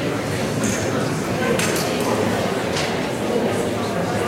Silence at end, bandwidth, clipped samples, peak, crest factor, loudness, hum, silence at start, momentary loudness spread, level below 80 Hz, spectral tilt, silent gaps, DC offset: 0 s; 16 kHz; under 0.1%; -4 dBFS; 16 dB; -21 LUFS; none; 0 s; 3 LU; -46 dBFS; -4.5 dB/octave; none; under 0.1%